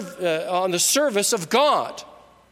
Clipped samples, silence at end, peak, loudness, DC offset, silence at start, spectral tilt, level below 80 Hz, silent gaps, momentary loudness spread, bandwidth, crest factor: under 0.1%; 0.35 s; -6 dBFS; -20 LUFS; under 0.1%; 0 s; -2 dB/octave; -70 dBFS; none; 8 LU; 16.5 kHz; 16 dB